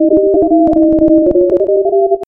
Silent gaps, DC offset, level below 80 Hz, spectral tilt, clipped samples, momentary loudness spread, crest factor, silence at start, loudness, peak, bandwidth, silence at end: none; under 0.1%; -36 dBFS; -11.5 dB/octave; under 0.1%; 3 LU; 10 dB; 0 s; -10 LUFS; 0 dBFS; 1.7 kHz; 0.05 s